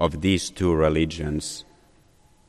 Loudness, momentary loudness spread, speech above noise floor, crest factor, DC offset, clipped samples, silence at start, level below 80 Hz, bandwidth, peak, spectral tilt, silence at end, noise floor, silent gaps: -24 LUFS; 11 LU; 34 dB; 18 dB; under 0.1%; under 0.1%; 0 s; -38 dBFS; 13 kHz; -8 dBFS; -5.5 dB/octave; 0.85 s; -57 dBFS; none